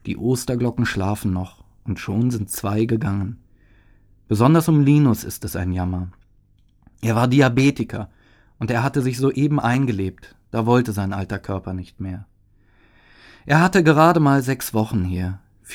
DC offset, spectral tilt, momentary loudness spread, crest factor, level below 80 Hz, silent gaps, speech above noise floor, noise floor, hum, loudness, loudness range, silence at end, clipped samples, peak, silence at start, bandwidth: under 0.1%; -6.5 dB/octave; 16 LU; 20 dB; -46 dBFS; none; 37 dB; -56 dBFS; none; -20 LUFS; 5 LU; 0 s; under 0.1%; 0 dBFS; 0.05 s; 18 kHz